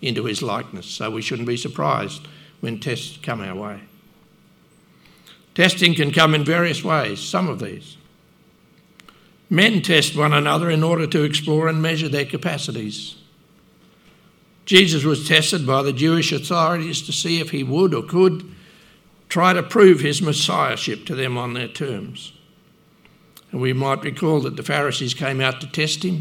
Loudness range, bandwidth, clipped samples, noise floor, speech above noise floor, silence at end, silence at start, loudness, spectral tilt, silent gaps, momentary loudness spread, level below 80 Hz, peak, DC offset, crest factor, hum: 8 LU; 17.5 kHz; under 0.1%; -54 dBFS; 35 dB; 0 s; 0 s; -19 LUFS; -4.5 dB/octave; none; 16 LU; -64 dBFS; 0 dBFS; under 0.1%; 20 dB; none